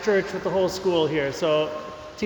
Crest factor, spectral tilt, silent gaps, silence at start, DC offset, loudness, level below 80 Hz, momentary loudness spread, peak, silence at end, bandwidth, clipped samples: 14 dB; -5 dB/octave; none; 0 s; under 0.1%; -24 LUFS; -54 dBFS; 8 LU; -10 dBFS; 0 s; 19 kHz; under 0.1%